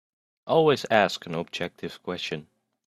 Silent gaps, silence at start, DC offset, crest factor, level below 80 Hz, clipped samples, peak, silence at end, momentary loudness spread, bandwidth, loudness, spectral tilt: none; 0.45 s; under 0.1%; 24 dB; -68 dBFS; under 0.1%; -4 dBFS; 0.45 s; 15 LU; 13.5 kHz; -26 LUFS; -5 dB/octave